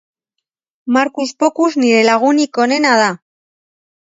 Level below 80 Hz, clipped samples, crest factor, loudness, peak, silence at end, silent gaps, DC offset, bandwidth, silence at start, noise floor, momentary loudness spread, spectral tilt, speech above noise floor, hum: -70 dBFS; under 0.1%; 16 dB; -13 LUFS; 0 dBFS; 1 s; none; under 0.1%; 8 kHz; 0.85 s; -78 dBFS; 7 LU; -3.5 dB/octave; 65 dB; none